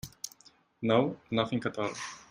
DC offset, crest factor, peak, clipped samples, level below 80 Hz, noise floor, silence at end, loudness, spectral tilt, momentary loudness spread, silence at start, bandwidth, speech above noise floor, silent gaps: under 0.1%; 22 dB; -12 dBFS; under 0.1%; -64 dBFS; -62 dBFS; 0.1 s; -31 LUFS; -5 dB/octave; 15 LU; 0.05 s; 16 kHz; 32 dB; none